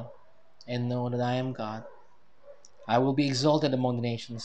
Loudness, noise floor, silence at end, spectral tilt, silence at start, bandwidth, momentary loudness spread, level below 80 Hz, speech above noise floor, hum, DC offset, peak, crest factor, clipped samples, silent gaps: -28 LUFS; -62 dBFS; 0 s; -6.5 dB/octave; 0 s; 9.4 kHz; 13 LU; -70 dBFS; 34 dB; none; 0.3%; -10 dBFS; 20 dB; under 0.1%; none